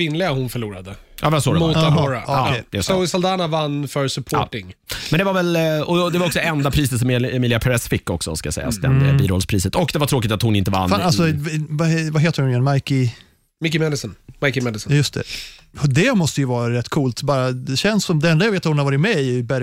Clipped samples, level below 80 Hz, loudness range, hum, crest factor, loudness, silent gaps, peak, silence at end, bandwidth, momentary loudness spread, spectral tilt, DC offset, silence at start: under 0.1%; -42 dBFS; 2 LU; none; 14 dB; -19 LUFS; none; -6 dBFS; 0 s; 16 kHz; 7 LU; -5.5 dB/octave; under 0.1%; 0 s